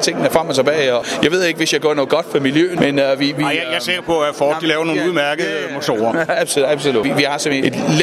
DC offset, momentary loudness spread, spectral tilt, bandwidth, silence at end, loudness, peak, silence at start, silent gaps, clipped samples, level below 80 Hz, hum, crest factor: under 0.1%; 3 LU; -4 dB/octave; 15 kHz; 0 s; -16 LUFS; 0 dBFS; 0 s; none; under 0.1%; -56 dBFS; none; 16 dB